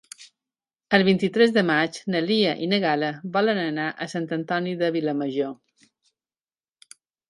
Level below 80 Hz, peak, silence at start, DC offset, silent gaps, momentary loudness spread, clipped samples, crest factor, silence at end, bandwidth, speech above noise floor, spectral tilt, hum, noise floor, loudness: -68 dBFS; -2 dBFS; 0.2 s; under 0.1%; none; 9 LU; under 0.1%; 22 dB; 1.75 s; 11.5 kHz; over 67 dB; -6 dB/octave; none; under -90 dBFS; -23 LUFS